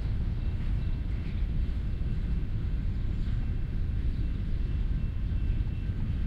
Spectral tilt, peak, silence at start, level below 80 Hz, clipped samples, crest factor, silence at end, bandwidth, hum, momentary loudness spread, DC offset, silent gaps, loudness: -9 dB/octave; -18 dBFS; 0 s; -30 dBFS; under 0.1%; 12 dB; 0 s; 5.2 kHz; none; 1 LU; under 0.1%; none; -33 LUFS